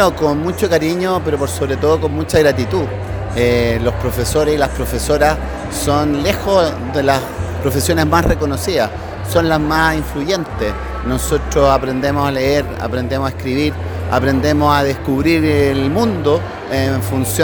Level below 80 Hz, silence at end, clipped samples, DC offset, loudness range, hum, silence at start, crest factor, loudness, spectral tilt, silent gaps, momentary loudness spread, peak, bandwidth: -28 dBFS; 0 s; under 0.1%; under 0.1%; 2 LU; none; 0 s; 16 dB; -16 LUFS; -5.5 dB/octave; none; 7 LU; 0 dBFS; over 20 kHz